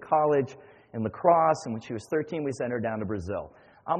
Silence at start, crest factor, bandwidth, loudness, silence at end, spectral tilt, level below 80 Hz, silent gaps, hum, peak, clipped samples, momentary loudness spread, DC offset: 0 s; 20 dB; 9.4 kHz; -28 LUFS; 0 s; -7 dB/octave; -60 dBFS; none; none; -8 dBFS; under 0.1%; 14 LU; under 0.1%